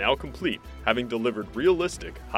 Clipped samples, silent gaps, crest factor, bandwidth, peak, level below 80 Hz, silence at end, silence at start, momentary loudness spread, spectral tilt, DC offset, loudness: under 0.1%; none; 22 dB; 14 kHz; -6 dBFS; -44 dBFS; 0 s; 0 s; 7 LU; -4.5 dB/octave; under 0.1%; -27 LUFS